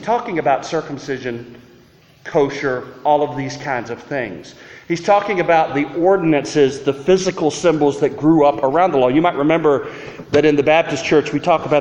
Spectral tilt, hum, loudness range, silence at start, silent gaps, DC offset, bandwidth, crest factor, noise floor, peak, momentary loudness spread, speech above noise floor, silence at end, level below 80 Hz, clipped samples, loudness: -5.5 dB/octave; none; 6 LU; 0 s; none; under 0.1%; 10 kHz; 16 dB; -49 dBFS; -2 dBFS; 11 LU; 32 dB; 0 s; -50 dBFS; under 0.1%; -17 LUFS